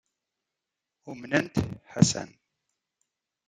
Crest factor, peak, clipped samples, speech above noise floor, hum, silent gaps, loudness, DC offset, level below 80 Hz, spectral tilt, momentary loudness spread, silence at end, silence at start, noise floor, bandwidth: 28 dB; -4 dBFS; under 0.1%; 60 dB; none; none; -27 LUFS; under 0.1%; -58 dBFS; -5 dB/octave; 20 LU; 1.2 s; 1.05 s; -87 dBFS; 13.5 kHz